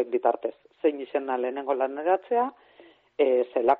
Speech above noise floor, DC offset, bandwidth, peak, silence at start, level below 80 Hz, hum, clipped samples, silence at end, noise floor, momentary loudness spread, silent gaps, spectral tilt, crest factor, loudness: 30 dB; under 0.1%; 4.2 kHz; -8 dBFS; 0 s; -76 dBFS; none; under 0.1%; 0 s; -55 dBFS; 8 LU; none; -2 dB/octave; 18 dB; -27 LUFS